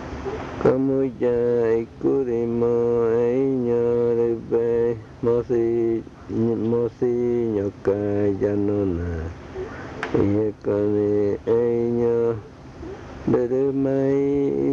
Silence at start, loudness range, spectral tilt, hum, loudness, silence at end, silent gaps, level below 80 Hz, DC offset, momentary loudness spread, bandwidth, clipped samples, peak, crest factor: 0 s; 3 LU; -9 dB/octave; none; -22 LUFS; 0 s; none; -48 dBFS; under 0.1%; 10 LU; 7 kHz; under 0.1%; -8 dBFS; 14 dB